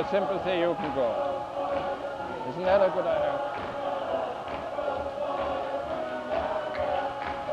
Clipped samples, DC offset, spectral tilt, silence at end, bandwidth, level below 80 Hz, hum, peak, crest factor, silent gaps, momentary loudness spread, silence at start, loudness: under 0.1%; under 0.1%; -6 dB/octave; 0 s; 9.8 kHz; -54 dBFS; none; -10 dBFS; 18 dB; none; 8 LU; 0 s; -29 LUFS